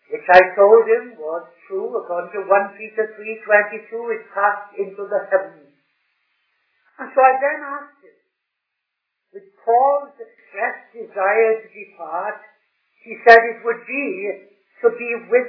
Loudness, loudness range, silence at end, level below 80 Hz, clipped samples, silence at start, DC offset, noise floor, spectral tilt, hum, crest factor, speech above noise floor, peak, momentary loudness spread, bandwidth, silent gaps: -18 LUFS; 6 LU; 0 s; -64 dBFS; 0.1%; 0.1 s; under 0.1%; -79 dBFS; -5 dB/octave; none; 20 dB; 61 dB; 0 dBFS; 19 LU; 5.4 kHz; none